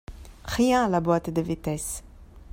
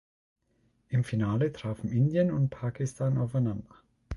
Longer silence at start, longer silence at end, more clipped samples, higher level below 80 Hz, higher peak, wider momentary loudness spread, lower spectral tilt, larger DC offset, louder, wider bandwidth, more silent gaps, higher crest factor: second, 0.1 s vs 0.9 s; about the same, 0 s vs 0 s; neither; first, -44 dBFS vs -52 dBFS; first, -8 dBFS vs -14 dBFS; first, 16 LU vs 7 LU; second, -5.5 dB/octave vs -8.5 dB/octave; neither; first, -25 LUFS vs -29 LUFS; first, 16.5 kHz vs 11.5 kHz; neither; about the same, 18 dB vs 16 dB